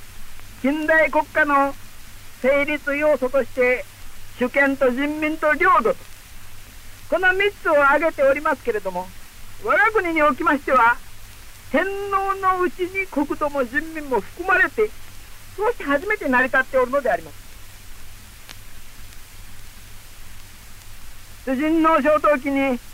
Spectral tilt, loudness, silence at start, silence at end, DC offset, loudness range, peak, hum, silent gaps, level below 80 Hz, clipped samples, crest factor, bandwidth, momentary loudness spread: -4.5 dB/octave; -20 LUFS; 0 s; 0 s; under 0.1%; 4 LU; -8 dBFS; none; none; -40 dBFS; under 0.1%; 14 dB; 16 kHz; 10 LU